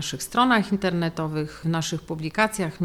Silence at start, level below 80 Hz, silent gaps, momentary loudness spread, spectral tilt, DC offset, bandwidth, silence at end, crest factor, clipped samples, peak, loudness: 0 s; -52 dBFS; none; 9 LU; -5 dB/octave; under 0.1%; 15.5 kHz; 0 s; 20 dB; under 0.1%; -6 dBFS; -24 LUFS